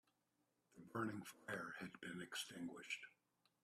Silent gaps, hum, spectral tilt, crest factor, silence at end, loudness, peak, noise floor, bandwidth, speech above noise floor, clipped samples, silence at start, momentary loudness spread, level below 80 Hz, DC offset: none; none; -3.5 dB/octave; 20 dB; 0.55 s; -50 LUFS; -32 dBFS; -86 dBFS; 15.5 kHz; 35 dB; under 0.1%; 0.7 s; 6 LU; -88 dBFS; under 0.1%